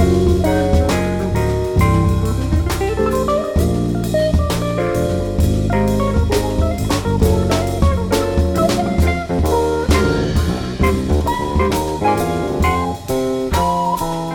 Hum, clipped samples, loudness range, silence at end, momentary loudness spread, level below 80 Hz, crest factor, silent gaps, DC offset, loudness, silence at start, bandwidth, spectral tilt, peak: none; under 0.1%; 1 LU; 0 s; 4 LU; -24 dBFS; 14 dB; none; under 0.1%; -17 LUFS; 0 s; 18 kHz; -6.5 dB/octave; -2 dBFS